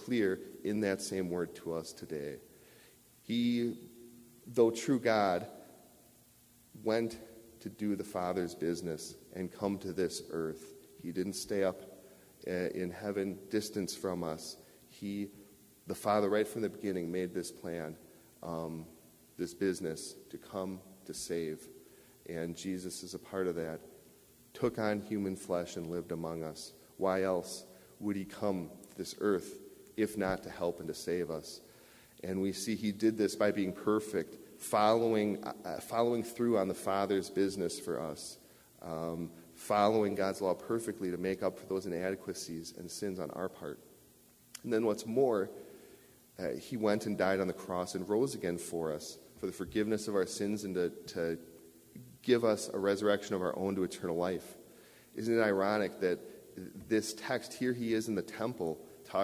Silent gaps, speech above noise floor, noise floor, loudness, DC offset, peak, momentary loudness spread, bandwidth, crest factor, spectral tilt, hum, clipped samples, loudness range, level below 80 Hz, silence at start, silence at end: none; 29 dB; -63 dBFS; -35 LUFS; under 0.1%; -14 dBFS; 17 LU; 16 kHz; 22 dB; -5 dB/octave; none; under 0.1%; 7 LU; -66 dBFS; 0 s; 0 s